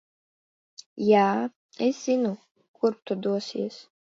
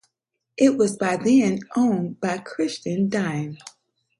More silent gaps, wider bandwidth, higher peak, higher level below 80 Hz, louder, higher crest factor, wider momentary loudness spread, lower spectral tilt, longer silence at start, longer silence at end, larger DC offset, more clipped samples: first, 1.56-1.69 s, 2.51-2.55 s, 2.68-2.74 s vs none; second, 7.8 kHz vs 11.5 kHz; about the same, -8 dBFS vs -6 dBFS; second, -78 dBFS vs -66 dBFS; second, -26 LUFS vs -22 LUFS; about the same, 20 dB vs 18 dB; first, 14 LU vs 11 LU; about the same, -6 dB/octave vs -6 dB/octave; first, 0.95 s vs 0.6 s; second, 0.35 s vs 0.5 s; neither; neither